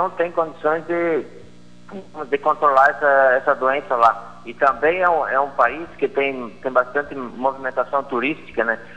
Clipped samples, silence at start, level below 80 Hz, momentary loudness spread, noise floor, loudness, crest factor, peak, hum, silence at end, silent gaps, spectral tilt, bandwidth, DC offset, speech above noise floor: under 0.1%; 0 s; -58 dBFS; 13 LU; -46 dBFS; -19 LUFS; 18 dB; -2 dBFS; 60 Hz at -50 dBFS; 0.05 s; none; -6 dB/octave; 9.4 kHz; 0.8%; 26 dB